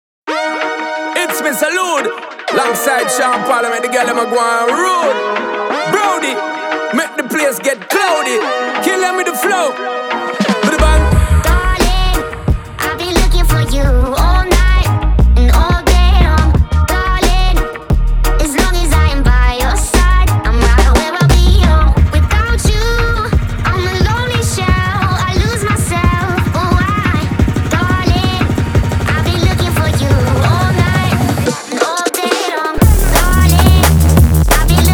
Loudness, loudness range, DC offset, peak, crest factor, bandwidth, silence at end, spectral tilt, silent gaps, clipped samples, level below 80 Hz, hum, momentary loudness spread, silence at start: -13 LUFS; 3 LU; under 0.1%; 0 dBFS; 12 dB; over 20 kHz; 0 s; -5 dB/octave; none; under 0.1%; -14 dBFS; none; 7 LU; 0.25 s